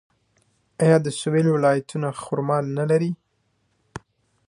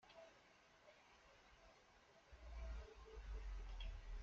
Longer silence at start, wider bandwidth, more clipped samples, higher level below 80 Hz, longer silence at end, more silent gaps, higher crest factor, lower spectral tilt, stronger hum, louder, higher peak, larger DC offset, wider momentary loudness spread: first, 0.8 s vs 0.05 s; first, 11 kHz vs 7.6 kHz; neither; second, -62 dBFS vs -56 dBFS; first, 0.5 s vs 0 s; neither; first, 20 dB vs 14 dB; first, -6.5 dB/octave vs -4 dB/octave; neither; first, -22 LUFS vs -59 LUFS; first, -4 dBFS vs -40 dBFS; neither; first, 23 LU vs 14 LU